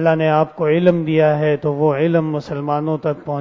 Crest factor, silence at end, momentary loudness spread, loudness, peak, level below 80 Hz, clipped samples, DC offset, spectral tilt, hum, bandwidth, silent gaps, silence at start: 16 dB; 0 s; 7 LU; -17 LUFS; -2 dBFS; -56 dBFS; under 0.1%; under 0.1%; -9 dB/octave; none; 6.6 kHz; none; 0 s